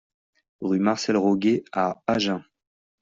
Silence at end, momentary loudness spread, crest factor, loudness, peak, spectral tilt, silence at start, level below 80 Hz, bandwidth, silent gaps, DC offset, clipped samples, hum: 0.6 s; 6 LU; 18 dB; -24 LUFS; -8 dBFS; -5.5 dB/octave; 0.6 s; -64 dBFS; 7.6 kHz; none; under 0.1%; under 0.1%; none